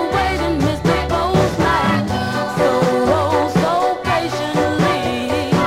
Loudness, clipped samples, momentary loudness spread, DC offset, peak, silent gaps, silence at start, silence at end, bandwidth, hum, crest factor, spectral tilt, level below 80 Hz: -17 LUFS; under 0.1%; 4 LU; under 0.1%; -2 dBFS; none; 0 s; 0 s; 16 kHz; none; 16 dB; -6 dB/octave; -34 dBFS